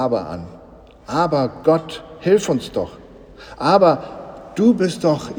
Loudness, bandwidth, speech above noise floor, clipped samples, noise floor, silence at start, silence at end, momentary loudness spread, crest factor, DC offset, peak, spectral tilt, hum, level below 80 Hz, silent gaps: -18 LUFS; over 20 kHz; 25 dB; under 0.1%; -43 dBFS; 0 s; 0 s; 19 LU; 18 dB; under 0.1%; 0 dBFS; -6 dB/octave; none; -50 dBFS; none